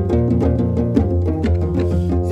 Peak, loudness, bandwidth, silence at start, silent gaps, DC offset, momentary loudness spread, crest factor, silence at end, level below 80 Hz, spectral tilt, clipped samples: -4 dBFS; -18 LUFS; 6 kHz; 0 s; none; under 0.1%; 2 LU; 14 dB; 0 s; -26 dBFS; -10 dB/octave; under 0.1%